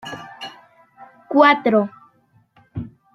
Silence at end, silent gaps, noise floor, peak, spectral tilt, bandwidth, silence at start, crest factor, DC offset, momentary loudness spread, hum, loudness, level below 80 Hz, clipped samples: 0.25 s; none; -58 dBFS; -2 dBFS; -6.5 dB/octave; 12 kHz; 0.05 s; 20 dB; under 0.1%; 22 LU; none; -16 LUFS; -56 dBFS; under 0.1%